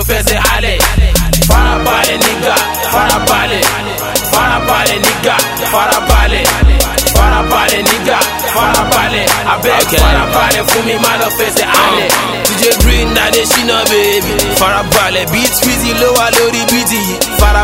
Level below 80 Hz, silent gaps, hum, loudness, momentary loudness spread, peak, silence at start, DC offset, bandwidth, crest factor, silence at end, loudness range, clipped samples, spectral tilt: -18 dBFS; none; none; -10 LUFS; 3 LU; 0 dBFS; 0 s; under 0.1%; 17 kHz; 10 dB; 0 s; 1 LU; 0.3%; -3 dB/octave